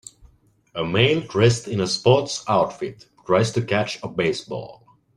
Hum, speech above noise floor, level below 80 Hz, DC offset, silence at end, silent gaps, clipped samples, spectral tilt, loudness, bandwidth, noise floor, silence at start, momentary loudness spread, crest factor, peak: none; 35 dB; -54 dBFS; under 0.1%; 0.45 s; none; under 0.1%; -5 dB/octave; -21 LUFS; 11.5 kHz; -56 dBFS; 0.75 s; 15 LU; 20 dB; -2 dBFS